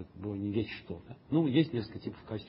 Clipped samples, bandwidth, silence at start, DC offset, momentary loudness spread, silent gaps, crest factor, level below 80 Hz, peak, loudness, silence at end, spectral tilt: under 0.1%; 5.8 kHz; 0 s; under 0.1%; 15 LU; none; 18 dB; -58 dBFS; -14 dBFS; -33 LUFS; 0 s; -11 dB/octave